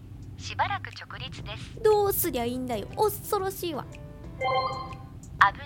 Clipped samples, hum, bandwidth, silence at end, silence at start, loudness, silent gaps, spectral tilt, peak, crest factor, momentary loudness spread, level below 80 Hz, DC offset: under 0.1%; none; 17.5 kHz; 0 s; 0 s; -28 LUFS; none; -4 dB/octave; -2 dBFS; 26 dB; 19 LU; -48 dBFS; under 0.1%